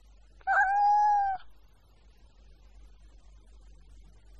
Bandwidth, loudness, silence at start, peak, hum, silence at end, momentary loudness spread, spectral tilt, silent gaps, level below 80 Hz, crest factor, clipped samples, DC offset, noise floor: 7.8 kHz; -26 LUFS; 0.45 s; -14 dBFS; none; 2.9 s; 14 LU; -2.5 dB/octave; none; -56 dBFS; 16 dB; under 0.1%; under 0.1%; -59 dBFS